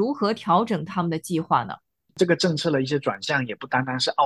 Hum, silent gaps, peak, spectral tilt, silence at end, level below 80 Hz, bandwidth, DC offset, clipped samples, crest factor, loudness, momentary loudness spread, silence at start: none; none; -6 dBFS; -5 dB/octave; 0 s; -64 dBFS; 12.5 kHz; under 0.1%; under 0.1%; 18 dB; -24 LUFS; 6 LU; 0 s